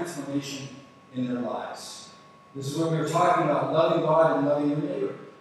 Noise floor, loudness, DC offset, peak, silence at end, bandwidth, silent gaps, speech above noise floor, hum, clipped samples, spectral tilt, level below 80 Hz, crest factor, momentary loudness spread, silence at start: -50 dBFS; -25 LUFS; under 0.1%; -10 dBFS; 0.1 s; 13 kHz; none; 24 dB; none; under 0.1%; -6 dB/octave; -76 dBFS; 18 dB; 17 LU; 0 s